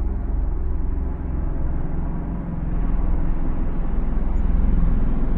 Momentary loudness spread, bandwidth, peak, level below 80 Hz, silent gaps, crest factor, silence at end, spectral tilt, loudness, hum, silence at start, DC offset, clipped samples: 5 LU; 2.7 kHz; -8 dBFS; -20 dBFS; none; 12 dB; 0 s; -11.5 dB/octave; -26 LUFS; none; 0 s; under 0.1%; under 0.1%